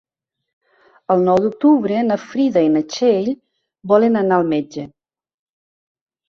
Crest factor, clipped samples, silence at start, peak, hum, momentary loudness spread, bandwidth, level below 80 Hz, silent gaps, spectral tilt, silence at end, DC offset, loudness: 16 dB; under 0.1%; 1.1 s; -2 dBFS; none; 16 LU; 7.2 kHz; -60 dBFS; none; -7 dB/octave; 1.45 s; under 0.1%; -16 LUFS